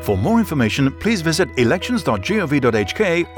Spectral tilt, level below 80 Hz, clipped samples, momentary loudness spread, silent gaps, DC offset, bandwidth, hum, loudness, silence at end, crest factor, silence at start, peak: -5.5 dB/octave; -40 dBFS; under 0.1%; 3 LU; none; under 0.1%; over 20 kHz; none; -18 LUFS; 0 s; 12 dB; 0 s; -6 dBFS